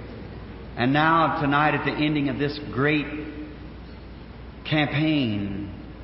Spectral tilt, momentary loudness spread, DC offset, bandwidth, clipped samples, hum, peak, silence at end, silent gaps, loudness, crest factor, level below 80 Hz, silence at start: -10.5 dB/octave; 21 LU; under 0.1%; 5.8 kHz; under 0.1%; none; -6 dBFS; 0 s; none; -23 LUFS; 18 dB; -44 dBFS; 0 s